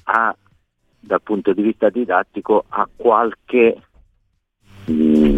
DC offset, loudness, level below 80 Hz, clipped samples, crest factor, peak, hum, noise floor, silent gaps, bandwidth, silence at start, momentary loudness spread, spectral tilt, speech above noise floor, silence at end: under 0.1%; -18 LUFS; -40 dBFS; under 0.1%; 18 dB; 0 dBFS; none; -65 dBFS; none; 5.4 kHz; 0.05 s; 8 LU; -8 dB/octave; 49 dB; 0 s